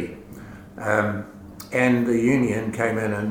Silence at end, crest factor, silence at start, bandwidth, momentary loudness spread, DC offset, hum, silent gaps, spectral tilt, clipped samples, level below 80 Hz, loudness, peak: 0 s; 18 dB; 0 s; 17 kHz; 21 LU; under 0.1%; none; none; -6.5 dB/octave; under 0.1%; -52 dBFS; -22 LUFS; -4 dBFS